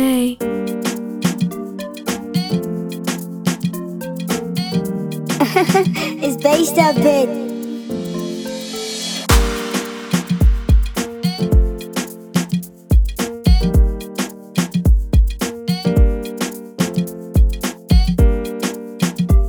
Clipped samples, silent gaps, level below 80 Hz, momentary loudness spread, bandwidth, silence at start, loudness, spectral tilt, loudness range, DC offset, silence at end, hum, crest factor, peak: under 0.1%; none; -20 dBFS; 10 LU; over 20 kHz; 0 s; -19 LUFS; -5.5 dB/octave; 6 LU; under 0.1%; 0 s; none; 16 dB; 0 dBFS